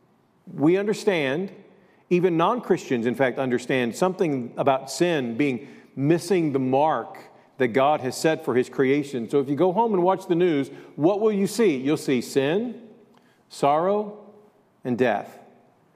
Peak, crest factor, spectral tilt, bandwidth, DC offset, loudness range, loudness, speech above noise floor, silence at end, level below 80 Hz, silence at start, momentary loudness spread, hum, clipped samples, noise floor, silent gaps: -6 dBFS; 18 dB; -6 dB/octave; 15 kHz; under 0.1%; 3 LU; -23 LUFS; 34 dB; 0.6 s; -74 dBFS; 0.45 s; 9 LU; none; under 0.1%; -57 dBFS; none